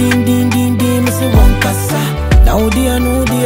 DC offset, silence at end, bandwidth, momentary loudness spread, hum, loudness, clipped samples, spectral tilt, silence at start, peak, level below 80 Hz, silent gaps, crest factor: under 0.1%; 0 s; 16.5 kHz; 4 LU; none; -12 LUFS; under 0.1%; -5.5 dB/octave; 0 s; 0 dBFS; -14 dBFS; none; 10 dB